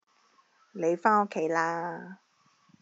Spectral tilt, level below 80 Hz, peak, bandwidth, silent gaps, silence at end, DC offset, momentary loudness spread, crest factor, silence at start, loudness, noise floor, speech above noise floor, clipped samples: -4.5 dB/octave; under -90 dBFS; -10 dBFS; 7.8 kHz; none; 0.65 s; under 0.1%; 20 LU; 22 dB; 0.75 s; -28 LUFS; -66 dBFS; 38 dB; under 0.1%